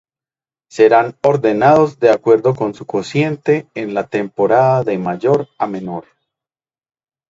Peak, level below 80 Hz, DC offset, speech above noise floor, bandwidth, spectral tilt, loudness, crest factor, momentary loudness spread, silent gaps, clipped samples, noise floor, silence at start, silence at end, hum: 0 dBFS; -58 dBFS; under 0.1%; over 76 dB; 7.8 kHz; -7.5 dB/octave; -15 LUFS; 16 dB; 11 LU; none; under 0.1%; under -90 dBFS; 0.75 s; 1.3 s; none